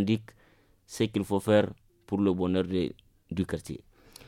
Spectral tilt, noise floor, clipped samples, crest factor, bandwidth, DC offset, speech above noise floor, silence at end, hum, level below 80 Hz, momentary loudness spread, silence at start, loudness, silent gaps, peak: -6.5 dB/octave; -62 dBFS; under 0.1%; 20 dB; 16 kHz; under 0.1%; 34 dB; 0.5 s; none; -58 dBFS; 13 LU; 0 s; -29 LUFS; none; -10 dBFS